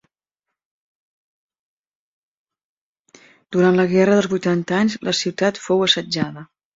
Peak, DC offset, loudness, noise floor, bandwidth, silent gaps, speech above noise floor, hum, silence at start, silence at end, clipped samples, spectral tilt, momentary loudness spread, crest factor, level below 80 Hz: -2 dBFS; under 0.1%; -18 LUFS; -83 dBFS; 7.8 kHz; none; 65 dB; none; 3.5 s; 0.3 s; under 0.1%; -5 dB/octave; 9 LU; 20 dB; -62 dBFS